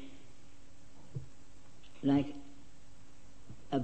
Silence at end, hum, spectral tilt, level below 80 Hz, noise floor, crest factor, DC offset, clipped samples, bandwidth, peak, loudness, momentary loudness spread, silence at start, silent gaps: 0 s; none; -7.5 dB/octave; -64 dBFS; -60 dBFS; 20 dB; 0.8%; under 0.1%; 8.4 kHz; -20 dBFS; -36 LUFS; 29 LU; 0 s; none